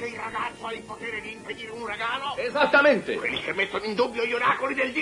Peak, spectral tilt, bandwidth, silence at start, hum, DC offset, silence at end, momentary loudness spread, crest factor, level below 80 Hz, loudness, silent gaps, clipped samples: -8 dBFS; -4 dB/octave; 11.5 kHz; 0 s; none; under 0.1%; 0 s; 15 LU; 18 dB; -60 dBFS; -25 LUFS; none; under 0.1%